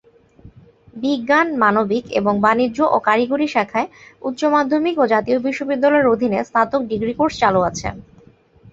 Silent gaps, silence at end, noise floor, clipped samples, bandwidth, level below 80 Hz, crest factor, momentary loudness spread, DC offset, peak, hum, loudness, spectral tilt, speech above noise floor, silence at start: none; 0.7 s; -50 dBFS; under 0.1%; 8 kHz; -50 dBFS; 18 dB; 7 LU; under 0.1%; -2 dBFS; none; -18 LUFS; -5.5 dB/octave; 32 dB; 0.45 s